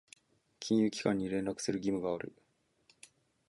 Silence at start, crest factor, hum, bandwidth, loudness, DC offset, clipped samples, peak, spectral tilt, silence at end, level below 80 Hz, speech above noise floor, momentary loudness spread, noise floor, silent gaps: 0.6 s; 20 dB; none; 11.5 kHz; -34 LUFS; under 0.1%; under 0.1%; -16 dBFS; -5.5 dB/octave; 1.2 s; -68 dBFS; 37 dB; 10 LU; -71 dBFS; none